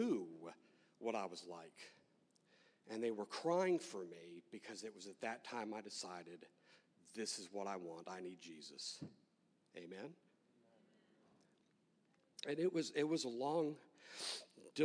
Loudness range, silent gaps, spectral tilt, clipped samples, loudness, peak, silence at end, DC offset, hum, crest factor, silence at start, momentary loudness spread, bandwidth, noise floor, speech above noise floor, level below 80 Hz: 11 LU; none; -4 dB/octave; under 0.1%; -45 LUFS; -26 dBFS; 0 s; under 0.1%; none; 22 dB; 0 s; 17 LU; 11 kHz; -78 dBFS; 34 dB; under -90 dBFS